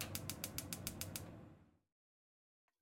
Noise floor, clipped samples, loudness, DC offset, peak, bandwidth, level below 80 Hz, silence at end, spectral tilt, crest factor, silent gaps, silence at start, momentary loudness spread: under -90 dBFS; under 0.1%; -46 LUFS; under 0.1%; -18 dBFS; 17 kHz; -68 dBFS; 1.1 s; -3 dB/octave; 32 dB; none; 0 s; 13 LU